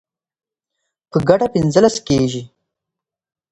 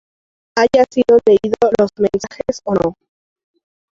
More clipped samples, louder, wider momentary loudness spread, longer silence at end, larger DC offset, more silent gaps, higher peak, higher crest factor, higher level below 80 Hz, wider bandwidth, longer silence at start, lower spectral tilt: neither; about the same, -16 LUFS vs -15 LUFS; second, 8 LU vs 11 LU; about the same, 1.05 s vs 1.05 s; neither; neither; about the same, 0 dBFS vs -2 dBFS; about the same, 18 dB vs 14 dB; about the same, -48 dBFS vs -48 dBFS; first, 11 kHz vs 7.6 kHz; first, 1.15 s vs 0.55 s; about the same, -6 dB/octave vs -5.5 dB/octave